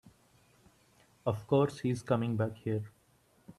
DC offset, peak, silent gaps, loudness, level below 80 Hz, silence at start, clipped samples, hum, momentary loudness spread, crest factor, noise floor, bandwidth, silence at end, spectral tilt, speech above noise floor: under 0.1%; -14 dBFS; none; -33 LUFS; -68 dBFS; 1.25 s; under 0.1%; none; 9 LU; 20 dB; -68 dBFS; 13 kHz; 0.05 s; -8 dB/octave; 36 dB